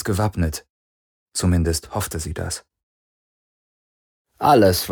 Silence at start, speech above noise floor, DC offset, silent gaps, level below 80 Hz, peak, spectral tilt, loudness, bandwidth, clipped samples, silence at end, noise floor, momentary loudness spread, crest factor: 0 s; over 71 dB; under 0.1%; 0.70-1.26 s, 2.83-4.25 s; -38 dBFS; -2 dBFS; -5 dB/octave; -21 LUFS; over 20 kHz; under 0.1%; 0 s; under -90 dBFS; 14 LU; 20 dB